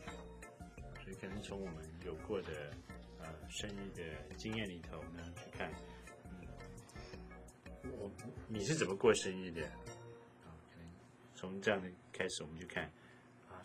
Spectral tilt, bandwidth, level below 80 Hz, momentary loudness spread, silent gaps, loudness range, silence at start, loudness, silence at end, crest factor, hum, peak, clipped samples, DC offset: -4.5 dB/octave; 16 kHz; -60 dBFS; 19 LU; none; 9 LU; 0 s; -43 LUFS; 0 s; 28 dB; none; -16 dBFS; under 0.1%; under 0.1%